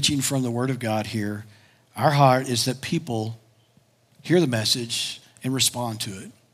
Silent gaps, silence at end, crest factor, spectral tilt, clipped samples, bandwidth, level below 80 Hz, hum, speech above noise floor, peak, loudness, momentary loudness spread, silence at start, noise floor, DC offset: none; 0.2 s; 20 dB; -4 dB/octave; under 0.1%; 16 kHz; -66 dBFS; none; 37 dB; -4 dBFS; -23 LUFS; 15 LU; 0 s; -61 dBFS; under 0.1%